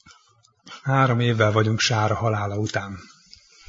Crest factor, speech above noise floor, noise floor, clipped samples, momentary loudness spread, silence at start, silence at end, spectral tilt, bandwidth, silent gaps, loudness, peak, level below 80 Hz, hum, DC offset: 20 dB; 38 dB; -59 dBFS; under 0.1%; 15 LU; 0.65 s; 0.65 s; -5 dB/octave; 7.6 kHz; none; -22 LUFS; -4 dBFS; -56 dBFS; none; under 0.1%